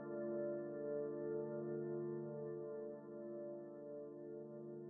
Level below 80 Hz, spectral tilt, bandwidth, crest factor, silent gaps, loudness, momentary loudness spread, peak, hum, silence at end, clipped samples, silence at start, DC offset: under -90 dBFS; -7.5 dB/octave; 1.9 kHz; 14 dB; none; -47 LUFS; 8 LU; -34 dBFS; 50 Hz at -70 dBFS; 0 s; under 0.1%; 0 s; under 0.1%